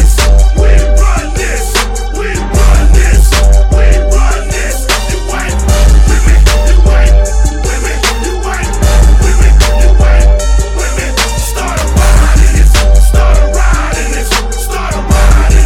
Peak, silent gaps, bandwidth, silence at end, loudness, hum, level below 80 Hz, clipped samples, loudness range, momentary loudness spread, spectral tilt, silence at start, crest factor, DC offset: 0 dBFS; none; 14.5 kHz; 0 s; -10 LUFS; none; -6 dBFS; 2%; 0 LU; 7 LU; -4.5 dB/octave; 0 s; 6 dB; under 0.1%